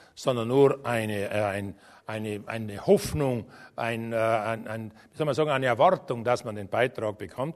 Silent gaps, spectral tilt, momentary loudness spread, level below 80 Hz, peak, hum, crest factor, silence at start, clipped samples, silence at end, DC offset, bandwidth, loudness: none; -6 dB/octave; 13 LU; -56 dBFS; -8 dBFS; none; 20 dB; 0.15 s; under 0.1%; 0 s; under 0.1%; 13.5 kHz; -27 LUFS